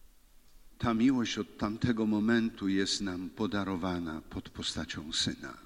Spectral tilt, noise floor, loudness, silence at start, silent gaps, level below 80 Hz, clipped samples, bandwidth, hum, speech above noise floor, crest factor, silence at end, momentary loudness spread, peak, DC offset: -4.5 dB/octave; -58 dBFS; -32 LUFS; 0.65 s; none; -54 dBFS; under 0.1%; 13 kHz; none; 26 dB; 16 dB; 0.05 s; 9 LU; -16 dBFS; under 0.1%